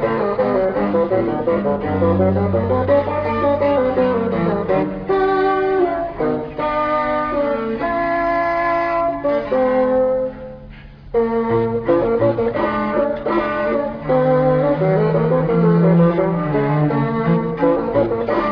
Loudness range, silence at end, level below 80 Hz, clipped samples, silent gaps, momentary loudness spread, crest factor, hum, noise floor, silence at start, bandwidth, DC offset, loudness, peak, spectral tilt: 3 LU; 0 s; -42 dBFS; under 0.1%; none; 5 LU; 14 dB; none; -37 dBFS; 0 s; 5.4 kHz; under 0.1%; -18 LUFS; -4 dBFS; -10 dB/octave